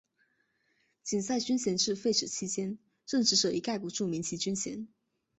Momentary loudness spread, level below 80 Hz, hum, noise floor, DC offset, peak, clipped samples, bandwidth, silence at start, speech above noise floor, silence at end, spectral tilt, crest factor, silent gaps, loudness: 13 LU; -70 dBFS; none; -75 dBFS; under 0.1%; -14 dBFS; under 0.1%; 8.2 kHz; 1.05 s; 43 dB; 0.5 s; -3 dB/octave; 20 dB; none; -31 LUFS